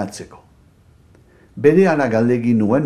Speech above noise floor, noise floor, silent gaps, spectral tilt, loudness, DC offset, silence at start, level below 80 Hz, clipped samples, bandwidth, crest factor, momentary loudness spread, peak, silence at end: 35 dB; -51 dBFS; none; -7.5 dB/octave; -15 LUFS; under 0.1%; 0 s; -54 dBFS; under 0.1%; 11 kHz; 18 dB; 12 LU; 0 dBFS; 0 s